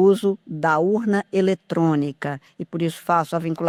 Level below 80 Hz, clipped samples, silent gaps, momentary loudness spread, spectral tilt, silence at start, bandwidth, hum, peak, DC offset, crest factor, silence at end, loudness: -64 dBFS; under 0.1%; none; 10 LU; -7 dB/octave; 0 s; 15 kHz; none; -6 dBFS; under 0.1%; 14 dB; 0 s; -22 LUFS